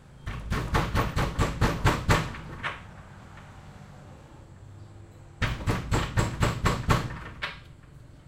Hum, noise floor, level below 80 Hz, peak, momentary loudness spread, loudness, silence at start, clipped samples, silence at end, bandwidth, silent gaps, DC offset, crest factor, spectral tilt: none; -49 dBFS; -36 dBFS; -8 dBFS; 23 LU; -29 LUFS; 0 s; under 0.1%; 0.05 s; 16.5 kHz; none; under 0.1%; 22 dB; -5.5 dB/octave